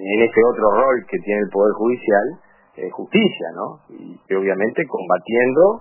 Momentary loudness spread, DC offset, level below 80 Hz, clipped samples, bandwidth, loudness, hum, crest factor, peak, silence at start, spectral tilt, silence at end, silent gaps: 16 LU; under 0.1%; -56 dBFS; under 0.1%; 3.1 kHz; -18 LUFS; none; 16 dB; -2 dBFS; 0 s; -10 dB/octave; 0 s; none